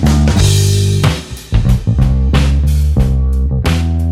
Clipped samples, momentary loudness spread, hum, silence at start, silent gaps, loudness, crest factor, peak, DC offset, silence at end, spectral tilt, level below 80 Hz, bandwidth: under 0.1%; 5 LU; none; 0 s; none; -13 LUFS; 10 dB; 0 dBFS; under 0.1%; 0 s; -6 dB/octave; -14 dBFS; 15.5 kHz